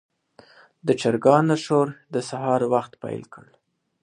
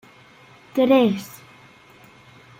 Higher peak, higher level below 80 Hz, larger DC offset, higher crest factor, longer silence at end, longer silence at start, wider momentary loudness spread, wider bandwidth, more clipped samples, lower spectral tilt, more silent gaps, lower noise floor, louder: about the same, -2 dBFS vs -4 dBFS; about the same, -68 dBFS vs -68 dBFS; neither; about the same, 22 dB vs 20 dB; second, 0.65 s vs 1.35 s; about the same, 0.85 s vs 0.75 s; second, 16 LU vs 24 LU; second, 11 kHz vs 16 kHz; neither; about the same, -6.5 dB/octave vs -6 dB/octave; neither; first, -53 dBFS vs -49 dBFS; second, -22 LUFS vs -19 LUFS